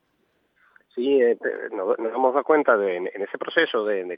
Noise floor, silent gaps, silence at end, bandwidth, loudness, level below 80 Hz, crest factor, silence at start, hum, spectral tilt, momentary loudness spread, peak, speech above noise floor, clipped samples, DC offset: -69 dBFS; none; 0 s; 5.2 kHz; -23 LUFS; under -90 dBFS; 20 dB; 0.95 s; none; -7.5 dB/octave; 9 LU; -4 dBFS; 46 dB; under 0.1%; under 0.1%